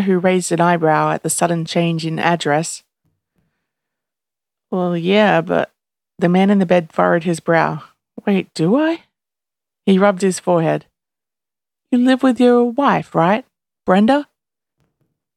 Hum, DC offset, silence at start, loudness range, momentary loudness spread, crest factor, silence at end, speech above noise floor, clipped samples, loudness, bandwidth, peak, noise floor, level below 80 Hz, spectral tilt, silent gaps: none; under 0.1%; 0 s; 4 LU; 8 LU; 18 dB; 1.15 s; 75 dB; under 0.1%; -16 LUFS; 13 kHz; 0 dBFS; -90 dBFS; -64 dBFS; -5.5 dB/octave; none